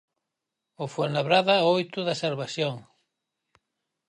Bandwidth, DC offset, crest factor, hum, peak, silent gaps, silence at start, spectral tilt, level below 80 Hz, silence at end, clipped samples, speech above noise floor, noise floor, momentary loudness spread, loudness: 10.5 kHz; under 0.1%; 20 dB; none; -8 dBFS; none; 0.8 s; -5 dB/octave; -76 dBFS; 1.25 s; under 0.1%; 60 dB; -85 dBFS; 13 LU; -25 LUFS